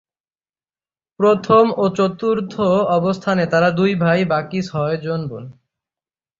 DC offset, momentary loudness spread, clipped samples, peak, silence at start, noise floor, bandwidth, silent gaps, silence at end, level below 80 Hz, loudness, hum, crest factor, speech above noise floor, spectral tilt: under 0.1%; 10 LU; under 0.1%; -2 dBFS; 1.2 s; under -90 dBFS; 7.6 kHz; none; 0.85 s; -56 dBFS; -17 LUFS; none; 16 dB; over 73 dB; -7.5 dB/octave